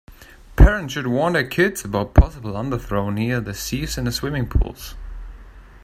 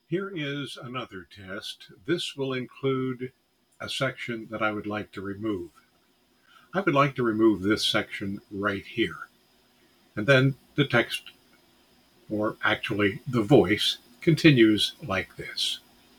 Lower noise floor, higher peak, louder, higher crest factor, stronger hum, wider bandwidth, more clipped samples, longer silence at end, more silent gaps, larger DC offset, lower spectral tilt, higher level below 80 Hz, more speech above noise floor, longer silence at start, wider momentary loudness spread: second, -41 dBFS vs -65 dBFS; first, 0 dBFS vs -6 dBFS; first, -21 LUFS vs -26 LUFS; about the same, 20 dB vs 22 dB; neither; second, 15.5 kHz vs 18.5 kHz; neither; second, 0.05 s vs 0.4 s; neither; neither; about the same, -6 dB/octave vs -5.5 dB/octave; first, -24 dBFS vs -62 dBFS; second, 23 dB vs 39 dB; about the same, 0.1 s vs 0.1 s; about the same, 18 LU vs 16 LU